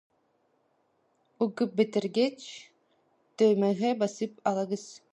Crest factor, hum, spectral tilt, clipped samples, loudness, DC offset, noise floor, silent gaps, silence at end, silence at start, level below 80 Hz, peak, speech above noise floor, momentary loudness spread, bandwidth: 18 dB; none; -6 dB/octave; under 0.1%; -28 LUFS; under 0.1%; -72 dBFS; none; 0.15 s; 1.4 s; -82 dBFS; -12 dBFS; 44 dB; 12 LU; 11 kHz